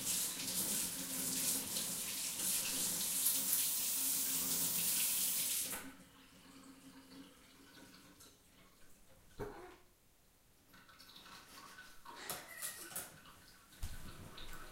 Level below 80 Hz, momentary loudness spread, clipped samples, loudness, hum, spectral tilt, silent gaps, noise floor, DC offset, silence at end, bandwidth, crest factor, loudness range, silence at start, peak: -62 dBFS; 25 LU; under 0.1%; -36 LUFS; none; -0.5 dB/octave; none; -69 dBFS; under 0.1%; 0 s; 16 kHz; 22 dB; 23 LU; 0 s; -20 dBFS